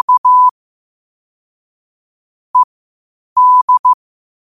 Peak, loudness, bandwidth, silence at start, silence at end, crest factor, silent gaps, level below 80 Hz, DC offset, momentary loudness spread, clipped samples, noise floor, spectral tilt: -4 dBFS; -11 LUFS; 1.3 kHz; 0.1 s; 0.6 s; 10 dB; 0.18-0.24 s, 0.51-2.54 s, 2.64-3.36 s, 3.62-3.68 s, 3.79-3.84 s; -68 dBFS; under 0.1%; 10 LU; under 0.1%; under -90 dBFS; -1 dB/octave